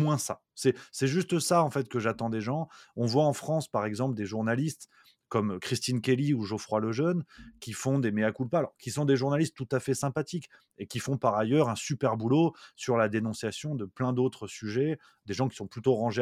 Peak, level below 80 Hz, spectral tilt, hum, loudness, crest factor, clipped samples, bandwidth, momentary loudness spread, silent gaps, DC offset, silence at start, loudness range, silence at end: -10 dBFS; -68 dBFS; -6 dB/octave; none; -30 LUFS; 18 dB; under 0.1%; 15.5 kHz; 9 LU; none; under 0.1%; 0 s; 2 LU; 0 s